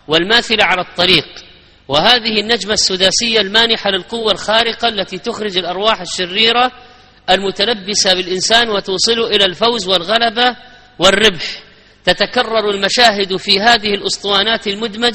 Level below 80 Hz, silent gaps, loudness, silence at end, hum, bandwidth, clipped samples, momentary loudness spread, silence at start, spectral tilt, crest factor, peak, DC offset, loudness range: -44 dBFS; none; -13 LUFS; 0 s; none; 19.5 kHz; 0.1%; 7 LU; 0.1 s; -2 dB/octave; 14 dB; 0 dBFS; under 0.1%; 2 LU